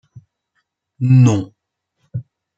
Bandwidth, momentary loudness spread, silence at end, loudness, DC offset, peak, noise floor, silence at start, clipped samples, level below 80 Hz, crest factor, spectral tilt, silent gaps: 7.8 kHz; 20 LU; 0.35 s; -14 LUFS; under 0.1%; -2 dBFS; -72 dBFS; 1 s; under 0.1%; -58 dBFS; 16 dB; -8 dB/octave; none